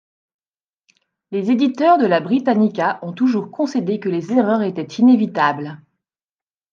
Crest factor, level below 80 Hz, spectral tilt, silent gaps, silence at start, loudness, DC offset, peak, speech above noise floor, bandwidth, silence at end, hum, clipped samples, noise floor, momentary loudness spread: 16 dB; -72 dBFS; -7 dB/octave; none; 1.3 s; -17 LUFS; under 0.1%; -2 dBFS; over 73 dB; 7.2 kHz; 0.95 s; none; under 0.1%; under -90 dBFS; 9 LU